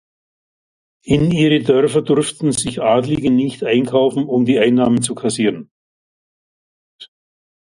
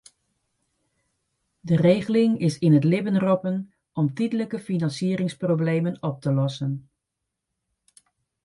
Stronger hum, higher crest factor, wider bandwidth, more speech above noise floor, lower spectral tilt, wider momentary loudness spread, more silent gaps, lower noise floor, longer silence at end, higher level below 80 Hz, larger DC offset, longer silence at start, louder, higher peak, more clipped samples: neither; about the same, 16 dB vs 20 dB; about the same, 11.5 kHz vs 11.5 kHz; first, over 75 dB vs 60 dB; second, -5.5 dB/octave vs -8 dB/octave; second, 5 LU vs 10 LU; first, 5.71-6.99 s vs none; first, under -90 dBFS vs -83 dBFS; second, 0.7 s vs 1.65 s; first, -48 dBFS vs -64 dBFS; neither; second, 1.05 s vs 1.65 s; first, -16 LUFS vs -23 LUFS; first, 0 dBFS vs -6 dBFS; neither